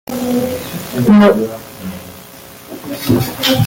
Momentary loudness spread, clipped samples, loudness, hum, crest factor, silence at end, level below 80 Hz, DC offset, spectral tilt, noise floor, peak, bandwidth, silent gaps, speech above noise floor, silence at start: 24 LU; under 0.1%; -14 LUFS; none; 14 dB; 0 s; -46 dBFS; under 0.1%; -5.5 dB/octave; -36 dBFS; -2 dBFS; 17 kHz; none; 23 dB; 0.1 s